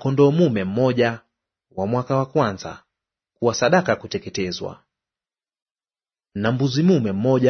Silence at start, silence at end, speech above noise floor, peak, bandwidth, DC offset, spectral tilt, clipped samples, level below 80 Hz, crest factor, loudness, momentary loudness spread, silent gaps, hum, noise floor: 0.05 s; 0 s; over 70 dB; -2 dBFS; 6.6 kHz; under 0.1%; -6.5 dB/octave; under 0.1%; -58 dBFS; 20 dB; -21 LUFS; 16 LU; none; none; under -90 dBFS